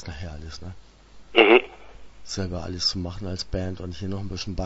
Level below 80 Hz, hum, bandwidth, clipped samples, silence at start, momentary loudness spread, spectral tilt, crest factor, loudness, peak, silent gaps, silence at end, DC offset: -42 dBFS; none; 8 kHz; under 0.1%; 0 s; 22 LU; -4.5 dB/octave; 24 dB; -23 LUFS; 0 dBFS; none; 0 s; under 0.1%